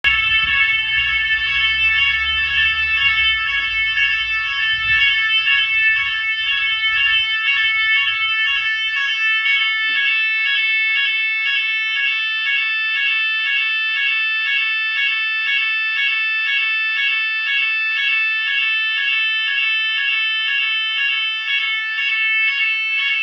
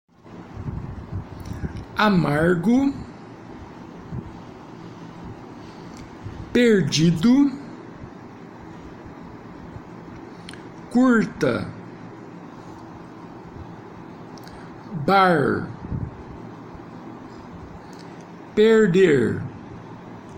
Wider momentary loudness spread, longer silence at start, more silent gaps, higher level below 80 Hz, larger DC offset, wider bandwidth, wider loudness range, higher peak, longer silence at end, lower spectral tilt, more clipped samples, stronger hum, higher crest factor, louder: second, 3 LU vs 23 LU; second, 0.05 s vs 0.25 s; neither; about the same, -48 dBFS vs -48 dBFS; neither; second, 7.4 kHz vs 16 kHz; second, 2 LU vs 14 LU; first, -2 dBFS vs -6 dBFS; about the same, 0 s vs 0 s; second, 0 dB/octave vs -6.5 dB/octave; neither; neither; about the same, 16 dB vs 18 dB; first, -15 LUFS vs -20 LUFS